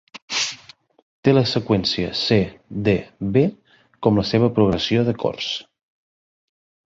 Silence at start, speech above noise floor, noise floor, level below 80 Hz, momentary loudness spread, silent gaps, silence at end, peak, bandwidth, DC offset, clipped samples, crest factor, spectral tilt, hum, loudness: 0.15 s; 28 dB; -47 dBFS; -48 dBFS; 8 LU; 0.22-0.28 s, 1.02-1.23 s; 1.25 s; -2 dBFS; 7.8 kHz; under 0.1%; under 0.1%; 20 dB; -5.5 dB/octave; none; -20 LUFS